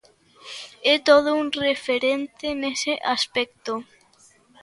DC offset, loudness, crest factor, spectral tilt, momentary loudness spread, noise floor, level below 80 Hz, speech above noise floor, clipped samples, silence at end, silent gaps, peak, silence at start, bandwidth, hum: under 0.1%; -22 LUFS; 22 dB; -2 dB/octave; 15 LU; -57 dBFS; -62 dBFS; 34 dB; under 0.1%; 0.8 s; none; -2 dBFS; 0.45 s; 11.5 kHz; none